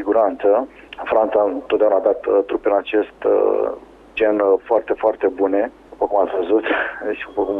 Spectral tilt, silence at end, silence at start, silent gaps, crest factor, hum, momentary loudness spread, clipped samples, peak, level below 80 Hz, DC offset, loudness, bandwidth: -7 dB/octave; 0 s; 0 s; none; 14 dB; none; 9 LU; under 0.1%; -4 dBFS; -54 dBFS; under 0.1%; -19 LUFS; 4 kHz